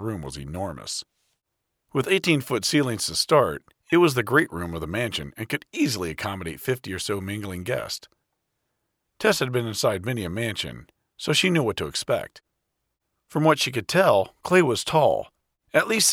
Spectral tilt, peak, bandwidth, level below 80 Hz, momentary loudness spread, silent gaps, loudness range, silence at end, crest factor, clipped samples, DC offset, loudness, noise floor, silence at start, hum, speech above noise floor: -4 dB/octave; -4 dBFS; 19.5 kHz; -54 dBFS; 12 LU; none; 6 LU; 0 s; 20 dB; under 0.1%; under 0.1%; -24 LUFS; -80 dBFS; 0 s; none; 56 dB